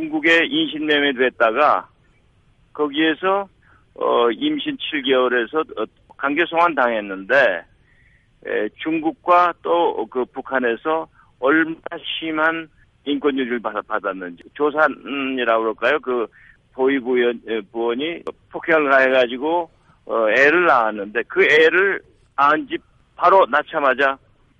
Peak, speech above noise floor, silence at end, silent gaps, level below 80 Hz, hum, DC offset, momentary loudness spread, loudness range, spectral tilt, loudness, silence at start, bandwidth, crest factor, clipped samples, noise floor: -2 dBFS; 38 dB; 0.45 s; none; -60 dBFS; none; under 0.1%; 13 LU; 5 LU; -5 dB/octave; -19 LUFS; 0 s; 8 kHz; 16 dB; under 0.1%; -57 dBFS